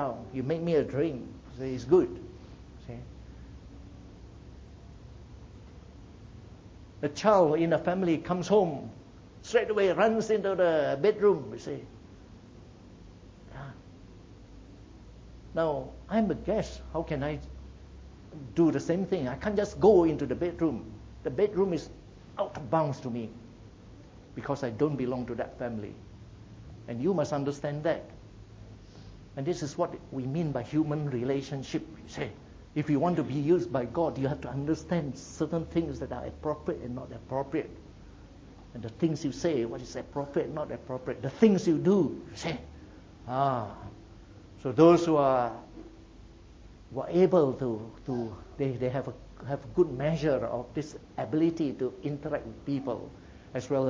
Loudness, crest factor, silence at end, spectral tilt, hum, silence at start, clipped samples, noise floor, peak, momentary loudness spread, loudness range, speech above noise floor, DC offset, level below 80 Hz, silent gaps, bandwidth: -30 LUFS; 24 dB; 0 s; -7 dB/octave; none; 0 s; under 0.1%; -51 dBFS; -8 dBFS; 25 LU; 8 LU; 22 dB; under 0.1%; -52 dBFS; none; 7.8 kHz